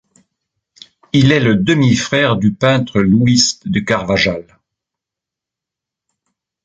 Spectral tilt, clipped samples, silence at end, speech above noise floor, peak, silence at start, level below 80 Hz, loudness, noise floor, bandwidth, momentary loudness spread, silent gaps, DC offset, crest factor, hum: -5 dB/octave; under 0.1%; 2.25 s; 71 dB; 0 dBFS; 1.15 s; -44 dBFS; -13 LUFS; -84 dBFS; 9.2 kHz; 6 LU; none; under 0.1%; 16 dB; none